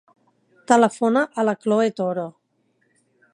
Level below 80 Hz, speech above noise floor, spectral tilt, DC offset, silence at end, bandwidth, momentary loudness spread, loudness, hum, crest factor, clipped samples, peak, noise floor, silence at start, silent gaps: -76 dBFS; 48 dB; -5.5 dB/octave; under 0.1%; 1.05 s; 11 kHz; 9 LU; -20 LUFS; none; 22 dB; under 0.1%; -2 dBFS; -67 dBFS; 0.7 s; none